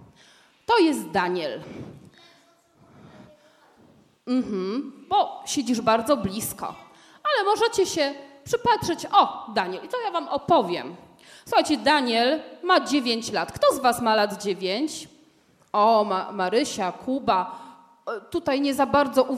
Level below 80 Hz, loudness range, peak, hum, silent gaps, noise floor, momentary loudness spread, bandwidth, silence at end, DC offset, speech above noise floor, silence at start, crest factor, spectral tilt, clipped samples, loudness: -60 dBFS; 7 LU; -4 dBFS; none; none; -60 dBFS; 13 LU; 16 kHz; 0 s; under 0.1%; 36 dB; 0.7 s; 20 dB; -3.5 dB/octave; under 0.1%; -23 LUFS